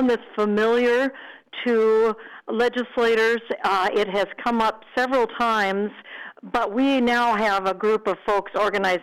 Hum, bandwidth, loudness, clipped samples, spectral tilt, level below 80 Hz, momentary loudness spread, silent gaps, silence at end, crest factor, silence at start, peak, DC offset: none; 14.5 kHz; -22 LUFS; under 0.1%; -5 dB/octave; -56 dBFS; 9 LU; none; 0 s; 8 dB; 0 s; -14 dBFS; under 0.1%